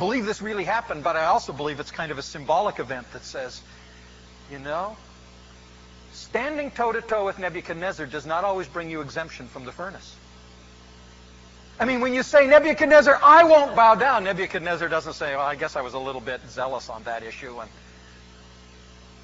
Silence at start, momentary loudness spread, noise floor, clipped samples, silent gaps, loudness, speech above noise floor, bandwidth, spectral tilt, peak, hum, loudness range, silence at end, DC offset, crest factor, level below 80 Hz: 0 s; 21 LU; -48 dBFS; under 0.1%; none; -21 LUFS; 26 dB; 8 kHz; -2.5 dB/octave; -2 dBFS; 60 Hz at -60 dBFS; 18 LU; 1.55 s; under 0.1%; 20 dB; -52 dBFS